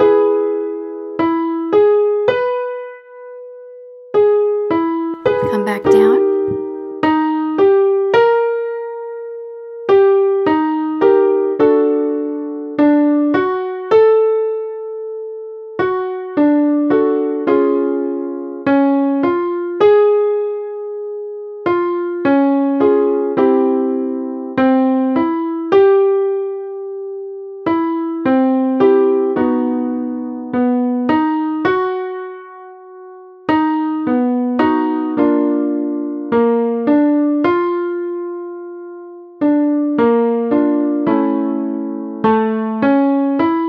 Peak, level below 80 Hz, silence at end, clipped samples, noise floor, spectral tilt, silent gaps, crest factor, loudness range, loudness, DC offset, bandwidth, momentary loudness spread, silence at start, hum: 0 dBFS; -58 dBFS; 0 s; under 0.1%; -37 dBFS; -8 dB/octave; none; 14 dB; 3 LU; -15 LUFS; under 0.1%; 6 kHz; 14 LU; 0 s; none